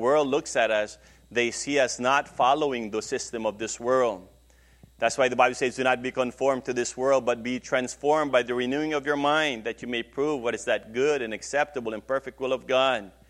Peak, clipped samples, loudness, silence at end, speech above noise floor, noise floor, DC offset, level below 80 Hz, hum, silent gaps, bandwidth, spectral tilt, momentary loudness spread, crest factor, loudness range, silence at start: -6 dBFS; under 0.1%; -26 LUFS; 0.2 s; 31 dB; -57 dBFS; under 0.1%; -58 dBFS; none; none; 12.5 kHz; -3.5 dB/octave; 8 LU; 20 dB; 2 LU; 0 s